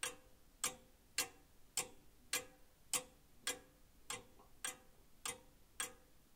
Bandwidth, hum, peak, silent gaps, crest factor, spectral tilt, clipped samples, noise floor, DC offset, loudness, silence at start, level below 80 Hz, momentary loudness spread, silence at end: 18 kHz; none; -22 dBFS; none; 28 dB; 0.5 dB/octave; under 0.1%; -65 dBFS; under 0.1%; -45 LUFS; 0.05 s; -70 dBFS; 18 LU; 0.15 s